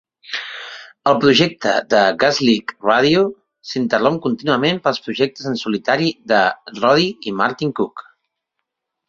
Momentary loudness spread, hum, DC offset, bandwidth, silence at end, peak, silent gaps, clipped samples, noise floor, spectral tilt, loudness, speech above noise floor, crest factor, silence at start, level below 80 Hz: 12 LU; none; under 0.1%; 7.6 kHz; 1.05 s; 0 dBFS; none; under 0.1%; -78 dBFS; -5 dB/octave; -17 LUFS; 61 dB; 18 dB; 0.3 s; -58 dBFS